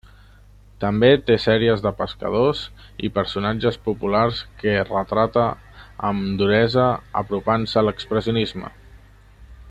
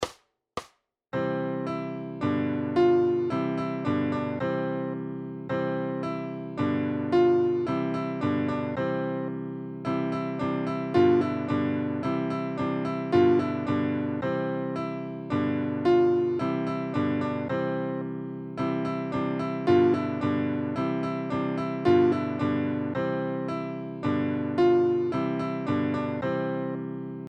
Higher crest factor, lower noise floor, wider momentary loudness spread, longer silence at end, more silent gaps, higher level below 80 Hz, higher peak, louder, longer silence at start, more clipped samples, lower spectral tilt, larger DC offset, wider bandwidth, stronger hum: about the same, 18 dB vs 16 dB; second, -48 dBFS vs -61 dBFS; about the same, 10 LU vs 11 LU; about the same, 0 s vs 0 s; neither; first, -44 dBFS vs -62 dBFS; first, -2 dBFS vs -10 dBFS; first, -21 LUFS vs -27 LUFS; first, 0.8 s vs 0 s; neither; about the same, -7.5 dB/octave vs -8.5 dB/octave; neither; first, 9.2 kHz vs 8 kHz; first, 50 Hz at -40 dBFS vs none